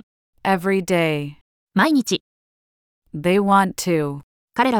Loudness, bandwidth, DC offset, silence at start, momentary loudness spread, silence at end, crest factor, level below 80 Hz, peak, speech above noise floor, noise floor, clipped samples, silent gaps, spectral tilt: -20 LUFS; 18.5 kHz; under 0.1%; 0.45 s; 12 LU; 0 s; 18 dB; -58 dBFS; -2 dBFS; over 71 dB; under -90 dBFS; under 0.1%; 1.41-1.67 s, 2.20-3.02 s, 4.23-4.48 s; -5 dB/octave